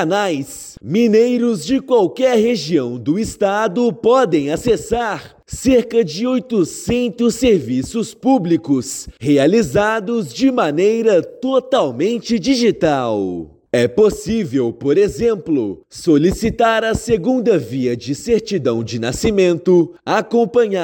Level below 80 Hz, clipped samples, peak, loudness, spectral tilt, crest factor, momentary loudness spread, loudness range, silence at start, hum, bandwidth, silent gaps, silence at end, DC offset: -42 dBFS; under 0.1%; -4 dBFS; -16 LUFS; -5.5 dB/octave; 12 dB; 7 LU; 1 LU; 0 s; none; 17 kHz; none; 0 s; under 0.1%